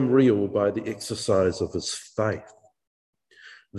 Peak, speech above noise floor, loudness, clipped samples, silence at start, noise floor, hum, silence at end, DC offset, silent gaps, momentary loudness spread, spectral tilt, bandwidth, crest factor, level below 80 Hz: -8 dBFS; 27 dB; -25 LUFS; under 0.1%; 0 s; -51 dBFS; none; 0 s; under 0.1%; 2.87-3.13 s; 11 LU; -5.5 dB/octave; 12.5 kHz; 18 dB; -52 dBFS